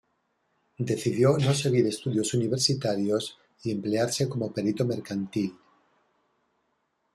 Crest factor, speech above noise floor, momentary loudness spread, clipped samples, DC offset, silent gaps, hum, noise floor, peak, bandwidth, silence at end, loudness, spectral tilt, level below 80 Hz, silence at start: 18 dB; 49 dB; 9 LU; under 0.1%; under 0.1%; none; none; -75 dBFS; -10 dBFS; 13.5 kHz; 1.6 s; -27 LUFS; -5.5 dB/octave; -66 dBFS; 0.8 s